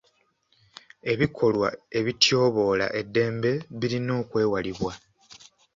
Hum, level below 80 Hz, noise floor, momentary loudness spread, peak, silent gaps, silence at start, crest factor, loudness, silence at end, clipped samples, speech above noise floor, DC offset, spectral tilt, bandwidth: none; -56 dBFS; -67 dBFS; 10 LU; -4 dBFS; none; 1.05 s; 22 dB; -25 LUFS; 0.8 s; under 0.1%; 43 dB; under 0.1%; -5 dB/octave; 7.8 kHz